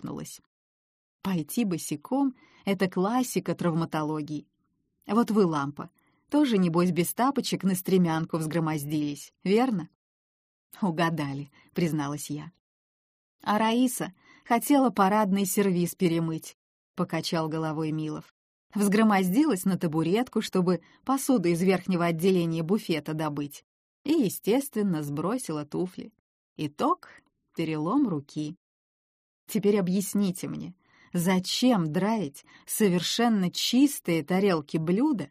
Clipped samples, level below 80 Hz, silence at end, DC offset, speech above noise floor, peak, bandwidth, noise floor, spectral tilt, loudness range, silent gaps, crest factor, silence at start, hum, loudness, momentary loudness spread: under 0.1%; -70 dBFS; 0.05 s; under 0.1%; 49 dB; -10 dBFS; 15.5 kHz; -75 dBFS; -5.5 dB/octave; 5 LU; 0.46-1.19 s, 9.95-10.70 s, 12.60-13.39 s, 16.54-16.94 s, 18.31-18.70 s, 23.64-24.05 s, 26.19-26.56 s, 28.57-29.47 s; 18 dB; 0 s; none; -27 LUFS; 13 LU